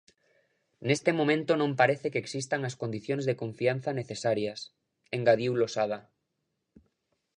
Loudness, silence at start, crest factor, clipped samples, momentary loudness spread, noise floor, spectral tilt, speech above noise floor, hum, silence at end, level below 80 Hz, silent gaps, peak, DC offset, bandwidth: -29 LUFS; 0.8 s; 22 dB; under 0.1%; 11 LU; -81 dBFS; -5.5 dB/octave; 53 dB; none; 1.35 s; -74 dBFS; none; -8 dBFS; under 0.1%; 10.5 kHz